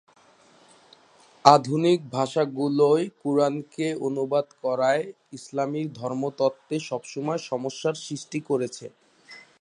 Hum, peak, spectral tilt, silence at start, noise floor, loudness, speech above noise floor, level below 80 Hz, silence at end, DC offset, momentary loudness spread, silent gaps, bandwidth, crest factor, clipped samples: none; 0 dBFS; -5.5 dB/octave; 1.45 s; -57 dBFS; -25 LUFS; 33 dB; -76 dBFS; 0.2 s; under 0.1%; 12 LU; none; 11 kHz; 26 dB; under 0.1%